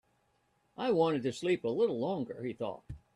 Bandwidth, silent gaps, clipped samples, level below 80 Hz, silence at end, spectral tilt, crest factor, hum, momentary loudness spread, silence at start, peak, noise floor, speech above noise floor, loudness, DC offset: 11 kHz; none; under 0.1%; -64 dBFS; 0.2 s; -6.5 dB/octave; 18 dB; none; 11 LU; 0.8 s; -16 dBFS; -74 dBFS; 42 dB; -33 LUFS; under 0.1%